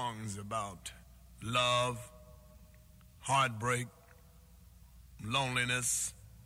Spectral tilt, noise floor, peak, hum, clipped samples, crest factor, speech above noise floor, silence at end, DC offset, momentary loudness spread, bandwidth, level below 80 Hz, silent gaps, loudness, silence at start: -2.5 dB/octave; -59 dBFS; -18 dBFS; none; under 0.1%; 20 dB; 25 dB; 0.05 s; under 0.1%; 16 LU; 16.5 kHz; -60 dBFS; none; -33 LUFS; 0 s